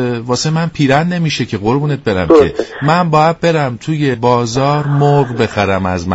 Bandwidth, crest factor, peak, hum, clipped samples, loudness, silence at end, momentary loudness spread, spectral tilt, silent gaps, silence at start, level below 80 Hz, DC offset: 8 kHz; 12 dB; 0 dBFS; none; under 0.1%; -13 LUFS; 0 s; 6 LU; -6 dB/octave; none; 0 s; -40 dBFS; under 0.1%